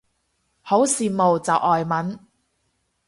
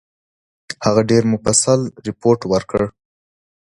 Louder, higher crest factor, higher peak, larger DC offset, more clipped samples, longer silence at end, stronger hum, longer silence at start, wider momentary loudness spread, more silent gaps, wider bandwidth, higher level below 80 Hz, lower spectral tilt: second, -20 LUFS vs -17 LUFS; about the same, 18 dB vs 18 dB; second, -4 dBFS vs 0 dBFS; neither; neither; about the same, 0.9 s vs 0.8 s; neither; about the same, 0.65 s vs 0.7 s; about the same, 9 LU vs 9 LU; neither; about the same, 12 kHz vs 11.5 kHz; second, -62 dBFS vs -48 dBFS; about the same, -4.5 dB/octave vs -4.5 dB/octave